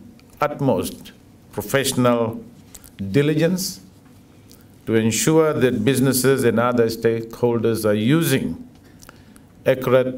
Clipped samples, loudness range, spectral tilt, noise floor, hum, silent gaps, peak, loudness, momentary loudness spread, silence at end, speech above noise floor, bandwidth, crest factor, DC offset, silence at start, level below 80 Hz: under 0.1%; 4 LU; -5 dB/octave; -48 dBFS; none; none; -4 dBFS; -19 LUFS; 14 LU; 0 s; 29 dB; 16.5 kHz; 16 dB; under 0.1%; 0 s; -52 dBFS